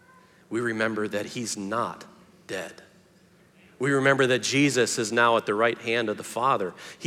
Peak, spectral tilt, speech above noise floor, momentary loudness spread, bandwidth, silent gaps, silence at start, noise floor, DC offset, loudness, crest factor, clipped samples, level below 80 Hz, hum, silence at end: -6 dBFS; -4 dB/octave; 33 dB; 13 LU; 16 kHz; none; 0.5 s; -58 dBFS; under 0.1%; -25 LUFS; 20 dB; under 0.1%; -76 dBFS; none; 0 s